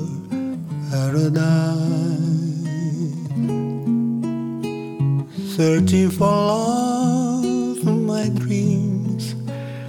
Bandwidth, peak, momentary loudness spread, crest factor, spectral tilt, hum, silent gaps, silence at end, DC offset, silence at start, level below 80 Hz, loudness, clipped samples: 17 kHz; -8 dBFS; 9 LU; 12 dB; -7 dB/octave; none; none; 0 s; under 0.1%; 0 s; -58 dBFS; -21 LUFS; under 0.1%